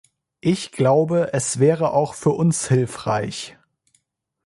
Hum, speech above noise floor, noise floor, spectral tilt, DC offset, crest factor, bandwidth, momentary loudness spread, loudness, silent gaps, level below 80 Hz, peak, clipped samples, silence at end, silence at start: none; 47 dB; -67 dBFS; -5.5 dB/octave; under 0.1%; 16 dB; 11.5 kHz; 8 LU; -20 LUFS; none; -58 dBFS; -4 dBFS; under 0.1%; 0.95 s; 0.45 s